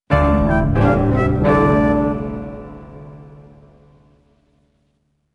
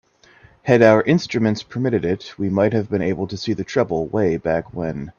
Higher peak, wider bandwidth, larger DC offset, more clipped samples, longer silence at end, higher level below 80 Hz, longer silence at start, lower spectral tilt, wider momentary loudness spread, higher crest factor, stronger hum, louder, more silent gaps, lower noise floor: about the same, -2 dBFS vs 0 dBFS; first, 8.8 kHz vs 7.4 kHz; neither; neither; first, 2.1 s vs 0.1 s; first, -28 dBFS vs -50 dBFS; second, 0.1 s vs 0.65 s; first, -9.5 dB/octave vs -7 dB/octave; first, 23 LU vs 11 LU; about the same, 18 dB vs 20 dB; neither; first, -16 LUFS vs -19 LUFS; neither; first, -65 dBFS vs -51 dBFS